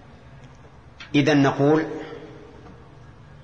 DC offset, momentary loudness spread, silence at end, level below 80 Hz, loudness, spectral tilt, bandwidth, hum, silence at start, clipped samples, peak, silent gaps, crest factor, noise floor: 0.2%; 25 LU; 0.7 s; -54 dBFS; -20 LUFS; -6.5 dB/octave; 7.2 kHz; none; 0.3 s; under 0.1%; -8 dBFS; none; 16 dB; -47 dBFS